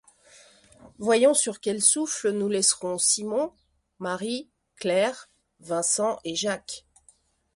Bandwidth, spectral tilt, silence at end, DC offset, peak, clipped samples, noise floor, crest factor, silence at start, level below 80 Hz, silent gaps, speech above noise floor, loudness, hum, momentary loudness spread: 12 kHz; -2 dB/octave; 0.75 s; under 0.1%; -6 dBFS; under 0.1%; -62 dBFS; 22 dB; 0.85 s; -68 dBFS; none; 37 dB; -24 LUFS; none; 13 LU